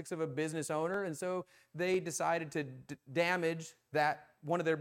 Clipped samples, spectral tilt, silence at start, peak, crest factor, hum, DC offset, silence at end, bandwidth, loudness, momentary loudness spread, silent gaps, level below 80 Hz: under 0.1%; -4.5 dB/octave; 0 s; -18 dBFS; 18 dB; none; under 0.1%; 0 s; 16.5 kHz; -36 LUFS; 10 LU; none; -80 dBFS